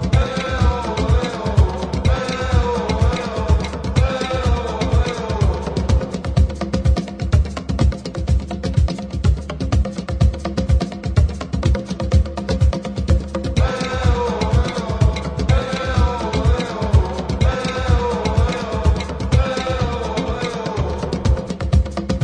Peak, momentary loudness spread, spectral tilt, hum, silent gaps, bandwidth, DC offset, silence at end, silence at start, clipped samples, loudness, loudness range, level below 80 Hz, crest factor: -2 dBFS; 4 LU; -6.5 dB/octave; none; none; 10 kHz; under 0.1%; 0 s; 0 s; under 0.1%; -20 LUFS; 2 LU; -22 dBFS; 16 dB